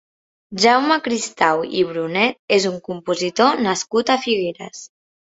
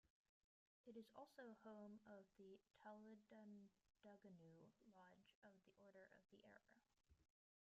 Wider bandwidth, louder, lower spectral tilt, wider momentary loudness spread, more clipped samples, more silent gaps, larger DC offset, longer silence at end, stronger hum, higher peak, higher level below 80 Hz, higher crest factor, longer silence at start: first, 8.2 kHz vs 7.2 kHz; first, -18 LUFS vs -65 LUFS; second, -3.5 dB/octave vs -5.5 dB/octave; first, 12 LU vs 6 LU; neither; second, 2.39-2.48 s vs 0.10-0.84 s, 5.35-5.42 s; neither; about the same, 0.5 s vs 0.45 s; neither; first, -2 dBFS vs -50 dBFS; first, -62 dBFS vs under -90 dBFS; about the same, 18 dB vs 18 dB; first, 0.5 s vs 0.05 s